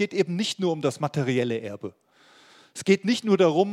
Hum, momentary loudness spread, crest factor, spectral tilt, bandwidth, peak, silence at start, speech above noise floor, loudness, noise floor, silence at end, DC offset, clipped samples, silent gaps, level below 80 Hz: none; 16 LU; 18 dB; -5.5 dB/octave; 13 kHz; -6 dBFS; 0 s; 31 dB; -24 LUFS; -55 dBFS; 0 s; under 0.1%; under 0.1%; none; -72 dBFS